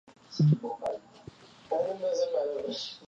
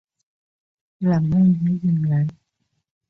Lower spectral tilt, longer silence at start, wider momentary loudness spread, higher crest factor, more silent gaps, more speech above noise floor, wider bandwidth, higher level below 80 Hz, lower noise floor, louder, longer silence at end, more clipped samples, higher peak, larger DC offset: second, -7.5 dB/octave vs -11 dB/octave; second, 0.1 s vs 1 s; first, 16 LU vs 7 LU; first, 18 dB vs 12 dB; neither; second, 23 dB vs 55 dB; first, 7.6 kHz vs 6 kHz; second, -70 dBFS vs -54 dBFS; second, -51 dBFS vs -73 dBFS; second, -30 LUFS vs -20 LUFS; second, 0 s vs 0.75 s; neither; about the same, -12 dBFS vs -10 dBFS; neither